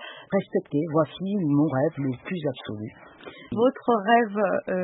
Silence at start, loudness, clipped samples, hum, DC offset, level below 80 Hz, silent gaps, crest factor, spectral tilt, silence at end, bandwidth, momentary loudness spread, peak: 0 s; -25 LUFS; under 0.1%; none; under 0.1%; -64 dBFS; none; 18 dB; -11.5 dB/octave; 0 s; 4 kHz; 16 LU; -8 dBFS